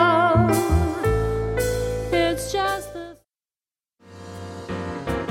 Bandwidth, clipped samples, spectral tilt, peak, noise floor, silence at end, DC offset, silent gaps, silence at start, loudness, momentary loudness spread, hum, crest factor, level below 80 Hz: 16.5 kHz; under 0.1%; -6 dB/octave; -4 dBFS; under -90 dBFS; 0 s; under 0.1%; none; 0 s; -22 LUFS; 20 LU; none; 18 dB; -34 dBFS